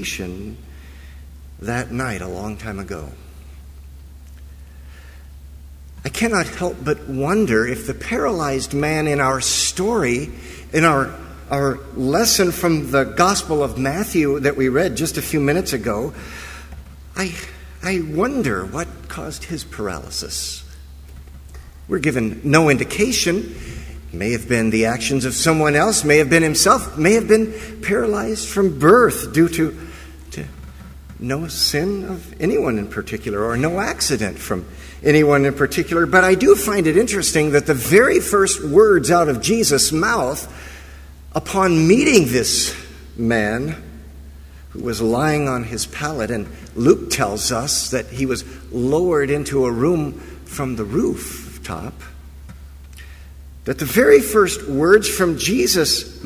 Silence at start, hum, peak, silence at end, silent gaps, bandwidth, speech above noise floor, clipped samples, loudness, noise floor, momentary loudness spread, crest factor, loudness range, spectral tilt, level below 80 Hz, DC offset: 0 s; none; 0 dBFS; 0 s; none; 16 kHz; 21 dB; under 0.1%; -18 LUFS; -39 dBFS; 18 LU; 18 dB; 11 LU; -4 dB/octave; -38 dBFS; under 0.1%